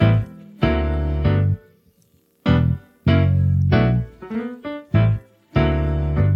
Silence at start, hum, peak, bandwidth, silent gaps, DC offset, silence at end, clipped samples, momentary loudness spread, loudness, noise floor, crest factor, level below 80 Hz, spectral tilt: 0 s; none; -2 dBFS; 5.8 kHz; none; under 0.1%; 0 s; under 0.1%; 11 LU; -20 LUFS; -59 dBFS; 16 dB; -28 dBFS; -9.5 dB/octave